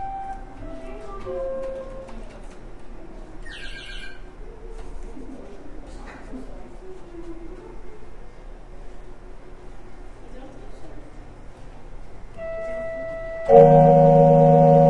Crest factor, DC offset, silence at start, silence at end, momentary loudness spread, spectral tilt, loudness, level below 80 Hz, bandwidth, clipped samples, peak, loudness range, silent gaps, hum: 22 dB; under 0.1%; 0 s; 0 s; 29 LU; -9.5 dB/octave; -17 LUFS; -40 dBFS; 8.6 kHz; under 0.1%; 0 dBFS; 26 LU; none; none